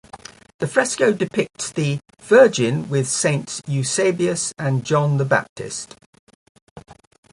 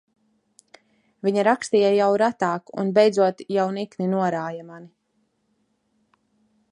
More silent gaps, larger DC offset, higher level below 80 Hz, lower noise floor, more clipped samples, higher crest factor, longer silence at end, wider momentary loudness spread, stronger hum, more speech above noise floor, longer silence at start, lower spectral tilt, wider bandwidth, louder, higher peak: first, 0.54-0.59 s, 5.49-5.56 s, 6.06-6.13 s, 6.19-6.27 s, 6.35-6.55 s, 6.62-6.76 s vs none; neither; first, -60 dBFS vs -76 dBFS; second, -42 dBFS vs -70 dBFS; neither; about the same, 20 dB vs 20 dB; second, 0.4 s vs 1.85 s; first, 14 LU vs 10 LU; neither; second, 22 dB vs 49 dB; second, 0.15 s vs 1.25 s; second, -4.5 dB/octave vs -6 dB/octave; about the same, 11.5 kHz vs 11 kHz; about the same, -20 LUFS vs -22 LUFS; first, 0 dBFS vs -4 dBFS